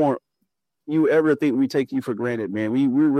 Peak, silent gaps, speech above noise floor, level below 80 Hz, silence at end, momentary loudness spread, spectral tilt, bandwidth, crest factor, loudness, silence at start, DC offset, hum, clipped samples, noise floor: -8 dBFS; none; 56 dB; -70 dBFS; 0 s; 8 LU; -7.5 dB/octave; 12.5 kHz; 14 dB; -22 LUFS; 0 s; under 0.1%; none; under 0.1%; -76 dBFS